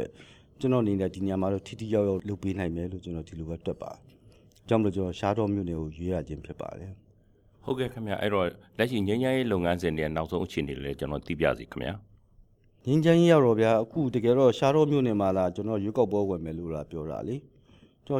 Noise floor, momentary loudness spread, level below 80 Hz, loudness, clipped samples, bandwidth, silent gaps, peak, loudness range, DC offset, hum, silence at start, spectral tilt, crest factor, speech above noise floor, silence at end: -61 dBFS; 16 LU; -52 dBFS; -28 LUFS; under 0.1%; 15.5 kHz; none; -8 dBFS; 9 LU; under 0.1%; none; 0 s; -7.5 dB/octave; 20 dB; 34 dB; 0 s